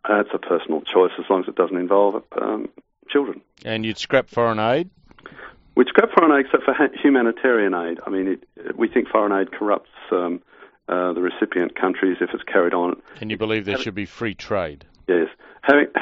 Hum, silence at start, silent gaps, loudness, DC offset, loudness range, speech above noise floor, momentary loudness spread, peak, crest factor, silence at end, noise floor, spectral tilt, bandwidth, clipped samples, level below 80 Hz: none; 0.05 s; none; -21 LUFS; under 0.1%; 5 LU; 22 dB; 12 LU; 0 dBFS; 20 dB; 0 s; -42 dBFS; -3.5 dB/octave; 7.6 kHz; under 0.1%; -58 dBFS